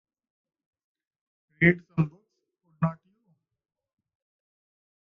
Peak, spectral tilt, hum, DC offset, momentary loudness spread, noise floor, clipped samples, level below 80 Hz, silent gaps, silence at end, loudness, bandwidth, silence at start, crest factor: -6 dBFS; -7 dB/octave; none; under 0.1%; 8 LU; -74 dBFS; under 0.1%; -62 dBFS; none; 2.2 s; -26 LUFS; 3.5 kHz; 1.6 s; 26 dB